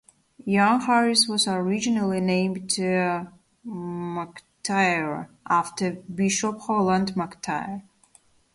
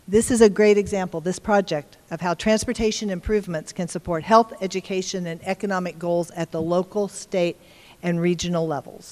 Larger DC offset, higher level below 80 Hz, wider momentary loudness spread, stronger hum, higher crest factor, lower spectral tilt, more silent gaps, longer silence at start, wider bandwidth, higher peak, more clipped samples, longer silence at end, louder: neither; second, -62 dBFS vs -46 dBFS; first, 15 LU vs 11 LU; neither; about the same, 18 dB vs 20 dB; about the same, -4 dB/octave vs -5 dB/octave; neither; first, 0.45 s vs 0.1 s; second, 11.5 kHz vs 15 kHz; second, -6 dBFS vs -2 dBFS; neither; first, 0.75 s vs 0 s; about the same, -24 LUFS vs -23 LUFS